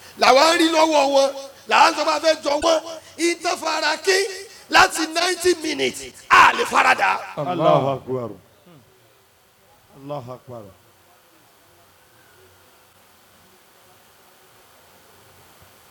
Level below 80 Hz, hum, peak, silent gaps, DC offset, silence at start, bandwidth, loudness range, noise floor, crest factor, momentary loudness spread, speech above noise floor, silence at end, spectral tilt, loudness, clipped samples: -58 dBFS; none; -4 dBFS; none; under 0.1%; 0.15 s; 19.5 kHz; 23 LU; -56 dBFS; 18 dB; 20 LU; 37 dB; 5.2 s; -2.5 dB/octave; -18 LUFS; under 0.1%